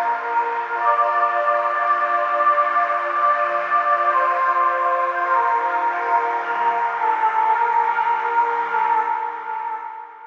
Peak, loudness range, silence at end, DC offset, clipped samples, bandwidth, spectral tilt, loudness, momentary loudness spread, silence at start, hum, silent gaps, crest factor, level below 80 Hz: -4 dBFS; 1 LU; 0 s; under 0.1%; under 0.1%; 7 kHz; -3 dB/octave; -19 LUFS; 5 LU; 0 s; none; none; 16 dB; under -90 dBFS